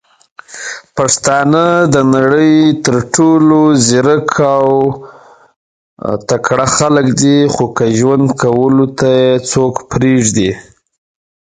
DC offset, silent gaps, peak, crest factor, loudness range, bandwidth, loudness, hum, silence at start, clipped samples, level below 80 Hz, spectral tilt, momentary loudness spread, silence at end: under 0.1%; 5.56-5.97 s; 0 dBFS; 12 dB; 4 LU; 9.6 kHz; -10 LUFS; none; 0.5 s; under 0.1%; -44 dBFS; -5 dB/octave; 10 LU; 0.95 s